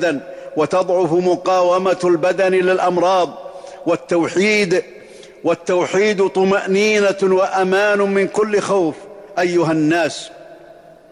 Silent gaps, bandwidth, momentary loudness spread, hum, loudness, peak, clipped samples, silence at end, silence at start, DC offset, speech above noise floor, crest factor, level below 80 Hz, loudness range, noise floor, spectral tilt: none; 11 kHz; 9 LU; none; -16 LUFS; -6 dBFS; under 0.1%; 0.55 s; 0 s; under 0.1%; 27 dB; 10 dB; -60 dBFS; 2 LU; -42 dBFS; -5 dB/octave